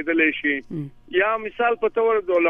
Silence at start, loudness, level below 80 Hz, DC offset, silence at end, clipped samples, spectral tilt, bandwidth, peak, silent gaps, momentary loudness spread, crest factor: 0 s; -21 LUFS; -56 dBFS; under 0.1%; 0 s; under 0.1%; -8 dB/octave; 3.7 kHz; -6 dBFS; none; 8 LU; 16 dB